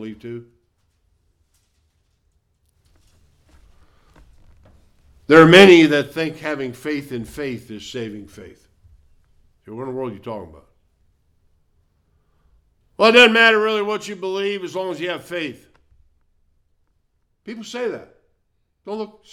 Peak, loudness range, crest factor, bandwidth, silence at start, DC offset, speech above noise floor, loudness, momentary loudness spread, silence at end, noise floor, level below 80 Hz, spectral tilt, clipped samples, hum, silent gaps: 0 dBFS; 21 LU; 20 dB; 15.5 kHz; 0 s; under 0.1%; 50 dB; -16 LUFS; 25 LU; 0.25 s; -68 dBFS; -56 dBFS; -5 dB/octave; under 0.1%; none; none